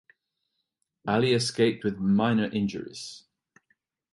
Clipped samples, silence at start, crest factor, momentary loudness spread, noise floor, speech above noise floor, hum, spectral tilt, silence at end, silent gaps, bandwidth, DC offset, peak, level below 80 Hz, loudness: under 0.1%; 1.05 s; 18 dB; 15 LU; -80 dBFS; 55 dB; none; -5.5 dB/octave; 0.95 s; none; 11.5 kHz; under 0.1%; -10 dBFS; -62 dBFS; -26 LUFS